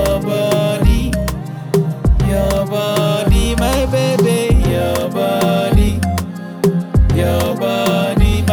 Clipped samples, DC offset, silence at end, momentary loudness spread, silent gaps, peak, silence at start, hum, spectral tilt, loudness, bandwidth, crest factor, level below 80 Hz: under 0.1%; under 0.1%; 0 s; 5 LU; none; -2 dBFS; 0 s; none; -6 dB/octave; -15 LUFS; 19.5 kHz; 12 dB; -20 dBFS